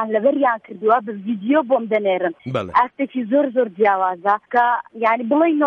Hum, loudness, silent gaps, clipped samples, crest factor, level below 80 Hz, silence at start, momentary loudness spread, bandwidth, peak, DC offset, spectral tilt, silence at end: none; -19 LUFS; none; under 0.1%; 14 dB; -64 dBFS; 0 s; 5 LU; 6.4 kHz; -4 dBFS; under 0.1%; -8 dB/octave; 0 s